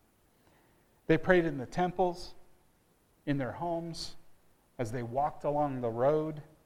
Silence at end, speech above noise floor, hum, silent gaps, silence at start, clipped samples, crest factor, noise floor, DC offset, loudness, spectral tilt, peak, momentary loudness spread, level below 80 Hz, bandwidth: 0.2 s; 37 dB; none; none; 1.1 s; under 0.1%; 22 dB; -68 dBFS; under 0.1%; -32 LUFS; -6.5 dB/octave; -10 dBFS; 15 LU; -54 dBFS; 15 kHz